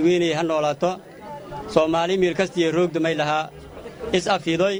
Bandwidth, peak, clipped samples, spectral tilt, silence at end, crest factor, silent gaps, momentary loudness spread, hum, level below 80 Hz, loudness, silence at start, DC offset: over 20 kHz; -2 dBFS; under 0.1%; -5 dB/octave; 0 s; 20 dB; none; 15 LU; none; -52 dBFS; -22 LUFS; 0 s; under 0.1%